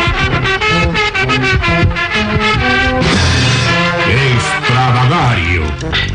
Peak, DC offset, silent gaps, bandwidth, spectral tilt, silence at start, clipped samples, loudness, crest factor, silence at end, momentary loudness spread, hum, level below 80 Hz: -2 dBFS; under 0.1%; none; 10 kHz; -5 dB/octave; 0 s; under 0.1%; -11 LUFS; 10 dB; 0 s; 3 LU; none; -24 dBFS